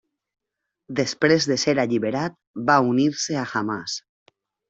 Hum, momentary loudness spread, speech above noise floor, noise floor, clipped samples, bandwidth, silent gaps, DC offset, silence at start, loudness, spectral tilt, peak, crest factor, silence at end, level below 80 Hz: none; 11 LU; 61 dB; -83 dBFS; under 0.1%; 8.2 kHz; 2.47-2.54 s; under 0.1%; 0.9 s; -22 LUFS; -4.5 dB/octave; -4 dBFS; 20 dB; 0.7 s; -64 dBFS